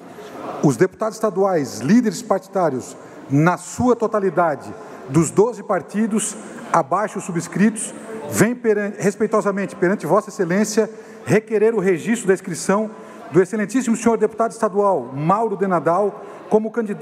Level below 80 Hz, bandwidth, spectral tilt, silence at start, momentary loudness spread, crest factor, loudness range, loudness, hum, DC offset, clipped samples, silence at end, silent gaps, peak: -60 dBFS; 15 kHz; -6 dB/octave; 0 s; 9 LU; 18 dB; 1 LU; -19 LUFS; none; under 0.1%; under 0.1%; 0 s; none; -2 dBFS